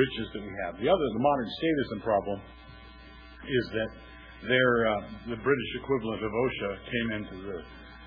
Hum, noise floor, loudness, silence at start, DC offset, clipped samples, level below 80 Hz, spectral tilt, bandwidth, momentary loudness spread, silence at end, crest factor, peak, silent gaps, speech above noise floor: none; -49 dBFS; -29 LUFS; 0 s; under 0.1%; under 0.1%; -52 dBFS; -8.5 dB/octave; 5.2 kHz; 23 LU; 0 s; 20 dB; -10 dBFS; none; 20 dB